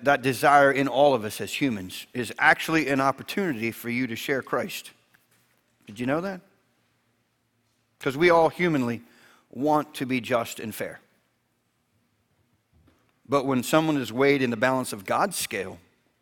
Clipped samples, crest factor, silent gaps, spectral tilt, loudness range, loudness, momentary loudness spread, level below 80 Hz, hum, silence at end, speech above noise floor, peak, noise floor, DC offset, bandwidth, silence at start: under 0.1%; 22 dB; none; -4.5 dB/octave; 10 LU; -24 LUFS; 14 LU; -64 dBFS; none; 0.45 s; 48 dB; -4 dBFS; -72 dBFS; under 0.1%; 19 kHz; 0 s